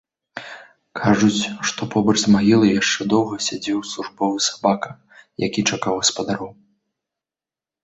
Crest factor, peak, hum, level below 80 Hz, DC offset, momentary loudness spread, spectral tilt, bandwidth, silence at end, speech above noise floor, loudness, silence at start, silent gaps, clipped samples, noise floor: 18 dB; -2 dBFS; none; -56 dBFS; under 0.1%; 19 LU; -4 dB/octave; 8.2 kHz; 1.3 s; over 71 dB; -19 LUFS; 0.35 s; none; under 0.1%; under -90 dBFS